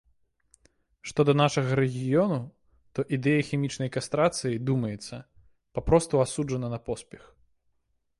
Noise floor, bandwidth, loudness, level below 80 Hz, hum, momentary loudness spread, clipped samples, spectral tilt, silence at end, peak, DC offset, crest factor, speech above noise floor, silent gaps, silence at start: -73 dBFS; 11.5 kHz; -27 LUFS; -50 dBFS; none; 14 LU; under 0.1%; -6 dB/octave; 1.05 s; -8 dBFS; under 0.1%; 20 dB; 47 dB; none; 1.05 s